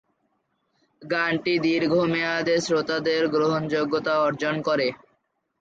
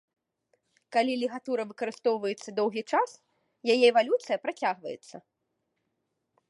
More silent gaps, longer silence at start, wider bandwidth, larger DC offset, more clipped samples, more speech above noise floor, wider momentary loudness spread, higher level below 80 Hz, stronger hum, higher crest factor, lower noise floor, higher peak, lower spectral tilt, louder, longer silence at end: neither; about the same, 1 s vs 0.9 s; second, 8.8 kHz vs 11.5 kHz; neither; neither; about the same, 49 dB vs 52 dB; second, 3 LU vs 13 LU; first, -66 dBFS vs -86 dBFS; neither; second, 16 dB vs 22 dB; second, -72 dBFS vs -80 dBFS; about the same, -8 dBFS vs -8 dBFS; first, -5 dB/octave vs -3.5 dB/octave; first, -23 LUFS vs -28 LUFS; second, 0.65 s vs 1.3 s